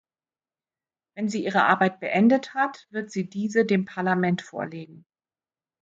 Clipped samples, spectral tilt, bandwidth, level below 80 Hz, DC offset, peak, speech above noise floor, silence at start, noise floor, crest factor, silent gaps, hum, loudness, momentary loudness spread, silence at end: under 0.1%; -6.5 dB/octave; 7.8 kHz; -72 dBFS; under 0.1%; -6 dBFS; over 66 dB; 1.15 s; under -90 dBFS; 20 dB; none; none; -24 LUFS; 14 LU; 0.85 s